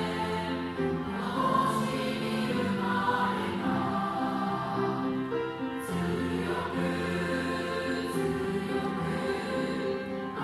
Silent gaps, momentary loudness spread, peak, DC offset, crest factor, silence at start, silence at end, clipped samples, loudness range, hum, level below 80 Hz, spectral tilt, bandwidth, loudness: none; 5 LU; -14 dBFS; under 0.1%; 16 dB; 0 s; 0 s; under 0.1%; 2 LU; none; -56 dBFS; -6 dB/octave; 14.5 kHz; -30 LUFS